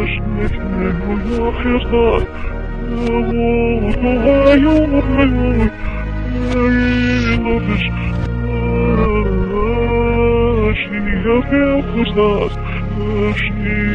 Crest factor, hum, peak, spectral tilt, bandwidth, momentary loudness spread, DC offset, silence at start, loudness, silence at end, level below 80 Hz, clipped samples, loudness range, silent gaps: 14 dB; none; 0 dBFS; -8.5 dB/octave; 7.2 kHz; 7 LU; under 0.1%; 0 s; -16 LUFS; 0 s; -22 dBFS; under 0.1%; 3 LU; none